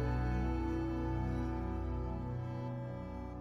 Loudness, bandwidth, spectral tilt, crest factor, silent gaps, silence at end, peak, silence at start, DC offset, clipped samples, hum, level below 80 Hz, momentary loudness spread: -39 LUFS; 6.4 kHz; -9 dB/octave; 12 dB; none; 0 s; -24 dBFS; 0 s; under 0.1%; under 0.1%; none; -42 dBFS; 7 LU